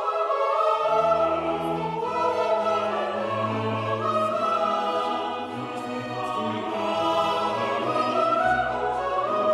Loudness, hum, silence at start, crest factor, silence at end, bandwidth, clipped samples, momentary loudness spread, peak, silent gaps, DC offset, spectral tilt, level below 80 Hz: -25 LUFS; none; 0 s; 16 dB; 0 s; 12.5 kHz; under 0.1%; 7 LU; -10 dBFS; none; under 0.1%; -5.5 dB/octave; -58 dBFS